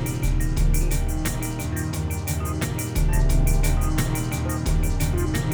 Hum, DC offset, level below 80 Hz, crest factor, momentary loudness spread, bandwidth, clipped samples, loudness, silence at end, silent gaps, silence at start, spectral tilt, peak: none; under 0.1%; -24 dBFS; 12 dB; 5 LU; over 20 kHz; under 0.1%; -25 LUFS; 0 s; none; 0 s; -5.5 dB/octave; -10 dBFS